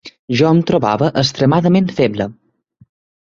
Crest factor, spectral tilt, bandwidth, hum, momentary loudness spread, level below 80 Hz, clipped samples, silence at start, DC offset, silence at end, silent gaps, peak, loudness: 14 dB; -6.5 dB/octave; 7.6 kHz; none; 8 LU; -50 dBFS; under 0.1%; 0.05 s; under 0.1%; 0.9 s; 0.19-0.28 s; 0 dBFS; -15 LUFS